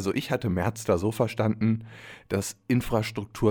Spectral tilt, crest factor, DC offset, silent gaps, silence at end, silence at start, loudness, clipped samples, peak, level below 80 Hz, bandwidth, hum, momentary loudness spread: -6 dB/octave; 16 dB; under 0.1%; none; 0 s; 0 s; -27 LUFS; under 0.1%; -10 dBFS; -48 dBFS; 19.5 kHz; none; 7 LU